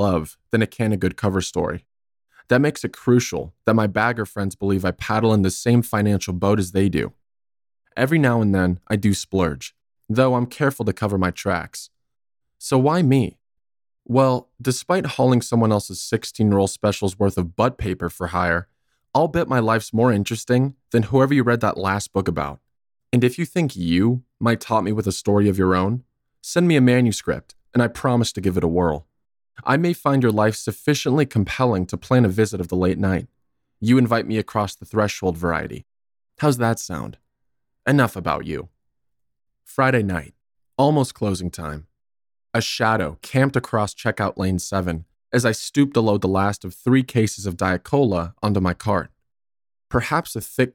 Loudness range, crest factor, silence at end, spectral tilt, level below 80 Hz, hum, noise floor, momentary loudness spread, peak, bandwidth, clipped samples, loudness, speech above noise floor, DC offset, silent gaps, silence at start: 4 LU; 18 dB; 0.05 s; -6 dB/octave; -46 dBFS; none; -78 dBFS; 9 LU; -4 dBFS; 17.5 kHz; under 0.1%; -21 LUFS; 58 dB; under 0.1%; none; 0 s